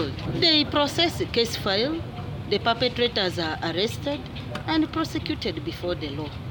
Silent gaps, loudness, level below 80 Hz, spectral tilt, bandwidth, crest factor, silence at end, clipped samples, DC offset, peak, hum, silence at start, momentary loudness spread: none; -25 LUFS; -46 dBFS; -5 dB/octave; over 20 kHz; 18 dB; 0 s; under 0.1%; under 0.1%; -8 dBFS; none; 0 s; 12 LU